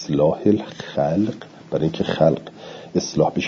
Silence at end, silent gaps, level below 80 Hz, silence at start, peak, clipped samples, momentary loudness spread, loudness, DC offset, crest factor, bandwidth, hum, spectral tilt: 0 s; none; -54 dBFS; 0 s; -2 dBFS; under 0.1%; 10 LU; -21 LUFS; under 0.1%; 18 dB; 7.4 kHz; none; -6.5 dB/octave